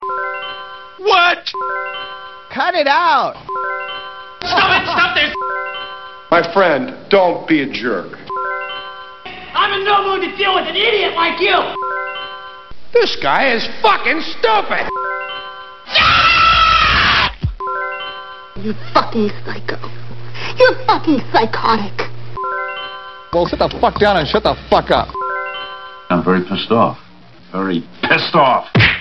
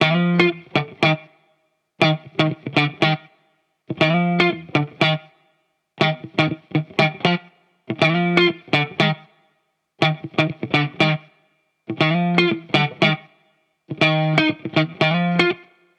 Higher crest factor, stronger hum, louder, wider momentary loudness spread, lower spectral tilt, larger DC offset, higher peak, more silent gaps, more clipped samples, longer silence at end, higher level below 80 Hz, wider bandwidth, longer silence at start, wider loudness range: about the same, 16 dB vs 18 dB; neither; first, -15 LUFS vs -19 LUFS; first, 16 LU vs 8 LU; about the same, -5.5 dB/octave vs -6.5 dB/octave; neither; about the same, 0 dBFS vs -2 dBFS; neither; neither; second, 0 s vs 0.4 s; first, -38 dBFS vs -64 dBFS; second, 6.4 kHz vs 9.2 kHz; about the same, 0 s vs 0 s; first, 5 LU vs 2 LU